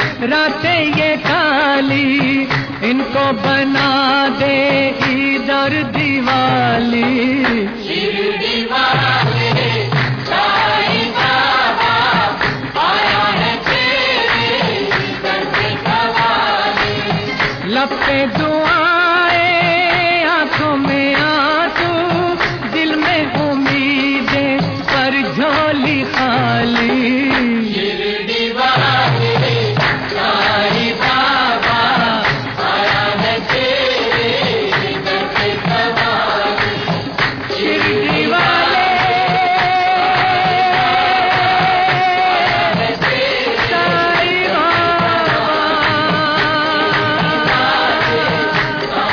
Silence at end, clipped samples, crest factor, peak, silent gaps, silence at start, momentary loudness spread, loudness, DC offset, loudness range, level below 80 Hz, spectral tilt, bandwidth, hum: 0 s; under 0.1%; 12 dB; -2 dBFS; none; 0 s; 4 LU; -14 LUFS; under 0.1%; 2 LU; -42 dBFS; -5.5 dB/octave; 5.4 kHz; none